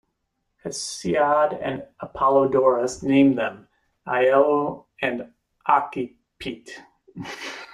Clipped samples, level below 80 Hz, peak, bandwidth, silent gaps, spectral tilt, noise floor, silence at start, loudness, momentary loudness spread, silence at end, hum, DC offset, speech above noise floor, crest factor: under 0.1%; -60 dBFS; -4 dBFS; 12 kHz; none; -5 dB/octave; -76 dBFS; 0.65 s; -22 LUFS; 19 LU; 0 s; none; under 0.1%; 54 dB; 18 dB